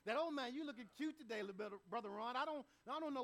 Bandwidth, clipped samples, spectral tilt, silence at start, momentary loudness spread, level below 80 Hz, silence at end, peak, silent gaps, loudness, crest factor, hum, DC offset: 15.5 kHz; under 0.1%; -4.5 dB/octave; 0.05 s; 7 LU; -86 dBFS; 0 s; -30 dBFS; none; -47 LUFS; 16 dB; none; under 0.1%